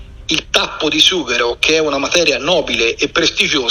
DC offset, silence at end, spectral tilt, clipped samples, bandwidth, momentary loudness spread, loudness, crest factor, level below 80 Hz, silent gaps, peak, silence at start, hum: under 0.1%; 0 s; -2 dB/octave; under 0.1%; 20 kHz; 5 LU; -13 LUFS; 16 dB; -40 dBFS; none; 0 dBFS; 0 s; none